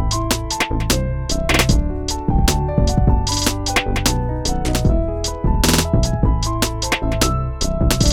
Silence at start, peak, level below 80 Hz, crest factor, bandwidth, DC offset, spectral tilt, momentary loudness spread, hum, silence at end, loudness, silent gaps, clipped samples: 0 s; -2 dBFS; -22 dBFS; 16 dB; 18 kHz; under 0.1%; -4.5 dB/octave; 6 LU; none; 0 s; -19 LUFS; none; under 0.1%